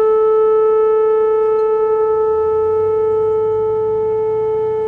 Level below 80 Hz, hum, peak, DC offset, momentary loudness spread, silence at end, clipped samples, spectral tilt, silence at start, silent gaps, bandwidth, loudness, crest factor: -48 dBFS; none; -8 dBFS; under 0.1%; 4 LU; 0 s; under 0.1%; -8 dB/octave; 0 s; none; 3.2 kHz; -15 LUFS; 6 dB